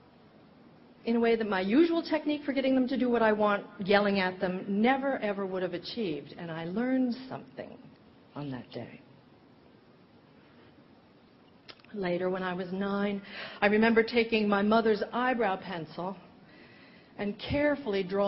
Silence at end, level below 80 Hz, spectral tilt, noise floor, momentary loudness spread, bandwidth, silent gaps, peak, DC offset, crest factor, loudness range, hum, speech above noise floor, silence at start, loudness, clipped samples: 0 s; -62 dBFS; -4 dB/octave; -59 dBFS; 16 LU; 5.8 kHz; none; -8 dBFS; under 0.1%; 22 dB; 17 LU; none; 30 dB; 1.05 s; -29 LUFS; under 0.1%